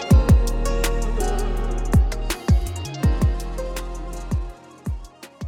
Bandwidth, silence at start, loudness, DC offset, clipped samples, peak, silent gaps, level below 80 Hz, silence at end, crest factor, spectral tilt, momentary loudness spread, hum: 17 kHz; 0 s; -23 LUFS; under 0.1%; under 0.1%; -4 dBFS; none; -22 dBFS; 0 s; 16 dB; -6 dB/octave; 14 LU; none